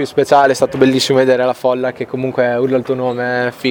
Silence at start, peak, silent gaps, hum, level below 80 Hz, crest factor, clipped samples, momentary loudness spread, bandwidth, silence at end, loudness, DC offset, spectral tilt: 0 s; 0 dBFS; none; none; -54 dBFS; 14 dB; under 0.1%; 8 LU; 19 kHz; 0 s; -14 LUFS; under 0.1%; -5 dB/octave